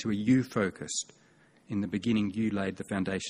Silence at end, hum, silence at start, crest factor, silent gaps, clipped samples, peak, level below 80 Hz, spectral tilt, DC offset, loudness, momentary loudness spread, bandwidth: 0 s; none; 0 s; 18 dB; none; under 0.1%; -14 dBFS; -62 dBFS; -5 dB/octave; under 0.1%; -31 LUFS; 8 LU; 13 kHz